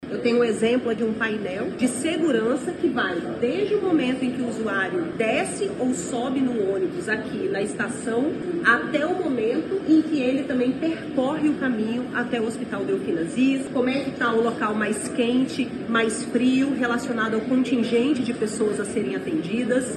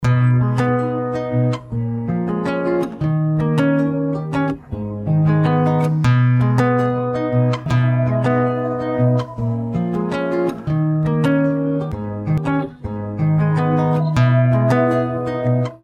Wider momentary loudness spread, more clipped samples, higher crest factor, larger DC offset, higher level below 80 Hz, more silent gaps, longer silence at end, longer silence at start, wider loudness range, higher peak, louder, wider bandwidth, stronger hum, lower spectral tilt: about the same, 5 LU vs 7 LU; neither; about the same, 18 dB vs 16 dB; neither; second, -58 dBFS vs -44 dBFS; neither; about the same, 0 s vs 0.1 s; about the same, 0 s vs 0 s; about the same, 2 LU vs 3 LU; second, -6 dBFS vs -2 dBFS; second, -24 LUFS vs -18 LUFS; first, 12 kHz vs 8.8 kHz; neither; second, -5 dB/octave vs -9 dB/octave